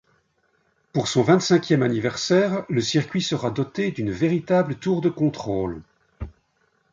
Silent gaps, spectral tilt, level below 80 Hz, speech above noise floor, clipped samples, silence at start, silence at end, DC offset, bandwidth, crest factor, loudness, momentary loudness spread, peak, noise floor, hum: none; -5.5 dB/octave; -50 dBFS; 45 dB; under 0.1%; 0.95 s; 0.65 s; under 0.1%; 7.6 kHz; 20 dB; -22 LUFS; 11 LU; -4 dBFS; -67 dBFS; none